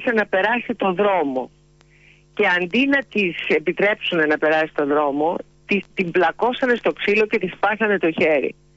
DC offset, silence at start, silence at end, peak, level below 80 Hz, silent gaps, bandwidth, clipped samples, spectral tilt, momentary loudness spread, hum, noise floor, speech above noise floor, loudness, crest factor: under 0.1%; 0 s; 0.25 s; -8 dBFS; -58 dBFS; none; 8 kHz; under 0.1%; -6 dB/octave; 5 LU; none; -53 dBFS; 33 dB; -19 LUFS; 12 dB